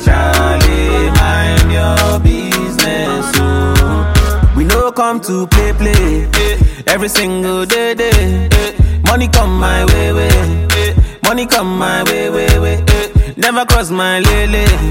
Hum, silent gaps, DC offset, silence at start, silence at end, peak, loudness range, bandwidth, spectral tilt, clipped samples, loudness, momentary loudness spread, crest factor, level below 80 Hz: none; none; under 0.1%; 0 s; 0 s; 0 dBFS; 1 LU; 17 kHz; -5 dB/octave; under 0.1%; -12 LUFS; 3 LU; 10 dB; -14 dBFS